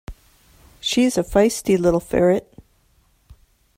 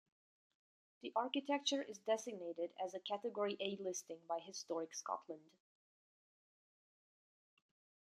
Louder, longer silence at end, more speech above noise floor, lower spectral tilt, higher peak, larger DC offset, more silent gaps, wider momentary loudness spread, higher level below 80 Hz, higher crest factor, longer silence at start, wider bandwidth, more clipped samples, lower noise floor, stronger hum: first, -19 LUFS vs -43 LUFS; second, 0.45 s vs 2.7 s; second, 42 dB vs over 47 dB; first, -5 dB/octave vs -2.5 dB/octave; first, -4 dBFS vs -24 dBFS; neither; neither; second, 5 LU vs 8 LU; first, -44 dBFS vs under -90 dBFS; about the same, 18 dB vs 22 dB; second, 0.1 s vs 1.05 s; first, 16 kHz vs 13.5 kHz; neither; second, -60 dBFS vs under -90 dBFS; neither